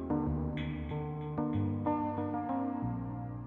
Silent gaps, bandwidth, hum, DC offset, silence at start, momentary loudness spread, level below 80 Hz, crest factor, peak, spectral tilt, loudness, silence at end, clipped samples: none; 4.1 kHz; none; under 0.1%; 0 s; 5 LU; -48 dBFS; 14 dB; -20 dBFS; -11 dB/octave; -35 LUFS; 0 s; under 0.1%